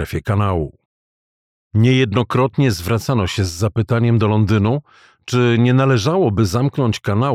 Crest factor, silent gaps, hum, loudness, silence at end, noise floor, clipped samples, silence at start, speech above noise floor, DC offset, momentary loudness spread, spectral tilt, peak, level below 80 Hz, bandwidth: 14 dB; 0.85-1.71 s; none; -17 LUFS; 0 s; under -90 dBFS; under 0.1%; 0 s; over 74 dB; under 0.1%; 6 LU; -6.5 dB/octave; -2 dBFS; -42 dBFS; 14.5 kHz